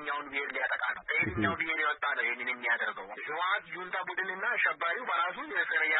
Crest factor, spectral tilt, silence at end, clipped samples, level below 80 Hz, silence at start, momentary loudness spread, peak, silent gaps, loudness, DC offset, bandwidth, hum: 16 dB; -7.5 dB/octave; 0 s; under 0.1%; -64 dBFS; 0 s; 6 LU; -16 dBFS; none; -31 LUFS; under 0.1%; 4.1 kHz; none